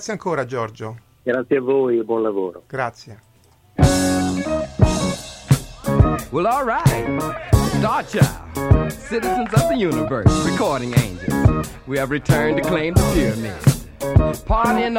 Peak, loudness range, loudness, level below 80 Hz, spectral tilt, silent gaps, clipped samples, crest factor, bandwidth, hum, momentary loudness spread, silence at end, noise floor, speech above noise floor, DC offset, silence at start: 0 dBFS; 3 LU; -19 LUFS; -30 dBFS; -6 dB/octave; none; under 0.1%; 18 dB; 17 kHz; none; 9 LU; 0 s; -53 dBFS; 34 dB; under 0.1%; 0 s